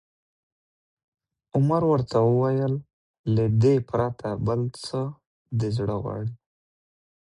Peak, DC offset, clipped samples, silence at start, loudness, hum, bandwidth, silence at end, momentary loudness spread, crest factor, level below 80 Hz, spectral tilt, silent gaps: -10 dBFS; under 0.1%; under 0.1%; 1.55 s; -25 LUFS; none; 11 kHz; 0.95 s; 11 LU; 16 dB; -52 dBFS; -8.5 dB/octave; 2.93-3.24 s, 5.26-5.45 s